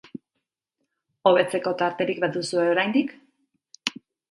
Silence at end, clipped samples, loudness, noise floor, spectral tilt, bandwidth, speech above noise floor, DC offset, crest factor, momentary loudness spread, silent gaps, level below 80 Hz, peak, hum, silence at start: 0.4 s; under 0.1%; -24 LUFS; -81 dBFS; -4.5 dB/octave; 11.5 kHz; 59 dB; under 0.1%; 24 dB; 12 LU; none; -74 dBFS; -2 dBFS; none; 0.15 s